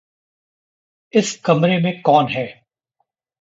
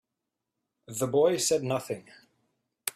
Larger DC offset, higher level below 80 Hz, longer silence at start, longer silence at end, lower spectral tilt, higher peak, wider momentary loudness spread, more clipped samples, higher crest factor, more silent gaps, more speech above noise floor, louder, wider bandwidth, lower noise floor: neither; first, -64 dBFS vs -70 dBFS; first, 1.15 s vs 0.9 s; first, 0.9 s vs 0.05 s; first, -5.5 dB/octave vs -4 dB/octave; first, -2 dBFS vs -8 dBFS; second, 8 LU vs 15 LU; neither; second, 18 dB vs 24 dB; neither; about the same, 56 dB vs 58 dB; first, -17 LUFS vs -28 LUFS; second, 8 kHz vs 15.5 kHz; second, -72 dBFS vs -86 dBFS